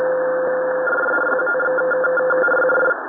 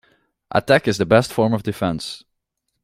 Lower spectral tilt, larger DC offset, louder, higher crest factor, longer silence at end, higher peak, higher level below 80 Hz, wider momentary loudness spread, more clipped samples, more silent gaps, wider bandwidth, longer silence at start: first, -8.5 dB/octave vs -5.5 dB/octave; neither; about the same, -18 LUFS vs -19 LUFS; second, 12 dB vs 20 dB; second, 0 s vs 0.65 s; second, -6 dBFS vs -2 dBFS; second, -72 dBFS vs -52 dBFS; second, 4 LU vs 12 LU; neither; neither; second, 3.6 kHz vs 16 kHz; second, 0 s vs 0.5 s